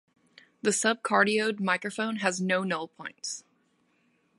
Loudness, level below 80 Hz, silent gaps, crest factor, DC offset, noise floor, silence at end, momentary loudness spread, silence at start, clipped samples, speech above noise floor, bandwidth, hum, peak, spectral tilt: -28 LUFS; -78 dBFS; none; 22 dB; under 0.1%; -70 dBFS; 1 s; 13 LU; 0.65 s; under 0.1%; 42 dB; 11.5 kHz; none; -8 dBFS; -3.5 dB/octave